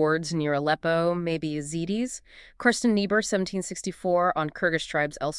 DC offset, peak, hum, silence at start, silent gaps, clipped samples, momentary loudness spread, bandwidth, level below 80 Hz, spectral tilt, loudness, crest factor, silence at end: under 0.1%; -6 dBFS; none; 0 s; none; under 0.1%; 7 LU; 12 kHz; -56 dBFS; -4.5 dB/octave; -26 LUFS; 20 dB; 0 s